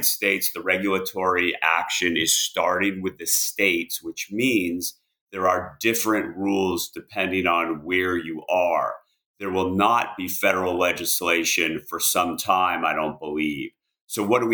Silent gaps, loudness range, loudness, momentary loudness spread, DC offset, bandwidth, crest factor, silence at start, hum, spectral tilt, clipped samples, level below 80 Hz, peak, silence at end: 5.21-5.27 s, 9.26-9.34 s, 14.01-14.08 s; 3 LU; -22 LUFS; 9 LU; under 0.1%; over 20 kHz; 20 dB; 0 s; none; -2.5 dB/octave; under 0.1%; -62 dBFS; -4 dBFS; 0 s